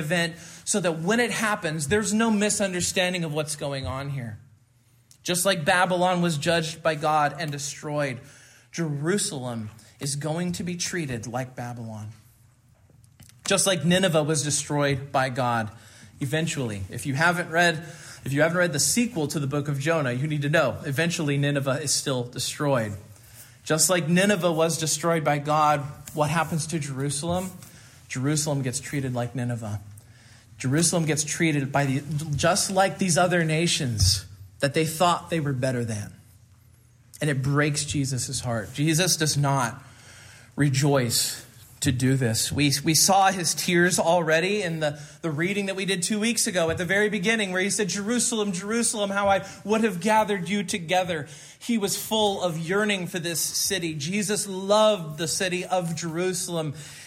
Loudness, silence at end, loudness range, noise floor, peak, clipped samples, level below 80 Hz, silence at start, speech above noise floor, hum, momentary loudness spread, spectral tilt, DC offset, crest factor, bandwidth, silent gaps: -24 LUFS; 0 s; 6 LU; -60 dBFS; -6 dBFS; under 0.1%; -58 dBFS; 0 s; 36 dB; none; 11 LU; -4 dB/octave; under 0.1%; 20 dB; 16 kHz; none